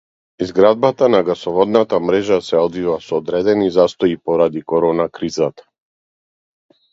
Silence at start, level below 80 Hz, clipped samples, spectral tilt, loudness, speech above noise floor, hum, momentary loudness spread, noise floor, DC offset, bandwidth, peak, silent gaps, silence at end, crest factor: 0.4 s; -52 dBFS; under 0.1%; -6.5 dB/octave; -16 LUFS; over 75 dB; none; 7 LU; under -90 dBFS; under 0.1%; 7.8 kHz; 0 dBFS; none; 1.4 s; 16 dB